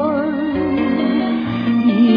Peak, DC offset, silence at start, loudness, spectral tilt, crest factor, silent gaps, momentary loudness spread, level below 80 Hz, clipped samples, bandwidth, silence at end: -4 dBFS; under 0.1%; 0 s; -17 LUFS; -9 dB/octave; 12 dB; none; 4 LU; -48 dBFS; under 0.1%; 5.2 kHz; 0 s